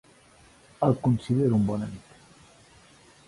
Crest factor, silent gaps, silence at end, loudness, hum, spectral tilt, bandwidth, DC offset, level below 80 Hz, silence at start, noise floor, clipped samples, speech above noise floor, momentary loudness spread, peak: 20 dB; none; 1.3 s; -26 LUFS; none; -9 dB/octave; 11.5 kHz; under 0.1%; -56 dBFS; 0.8 s; -56 dBFS; under 0.1%; 32 dB; 13 LU; -10 dBFS